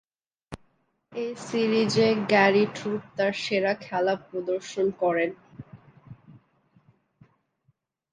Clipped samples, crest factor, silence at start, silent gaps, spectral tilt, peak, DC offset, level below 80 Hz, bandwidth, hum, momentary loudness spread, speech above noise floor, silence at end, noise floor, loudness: under 0.1%; 20 dB; 0.5 s; none; -5 dB/octave; -6 dBFS; under 0.1%; -66 dBFS; 9.8 kHz; none; 24 LU; 46 dB; 2 s; -71 dBFS; -25 LUFS